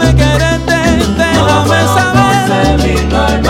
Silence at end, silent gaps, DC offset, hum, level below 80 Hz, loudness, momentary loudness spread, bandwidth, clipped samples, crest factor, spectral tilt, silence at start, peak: 0 s; none; under 0.1%; none; -18 dBFS; -10 LUFS; 3 LU; 16.5 kHz; 0.5%; 10 dB; -5.5 dB/octave; 0 s; 0 dBFS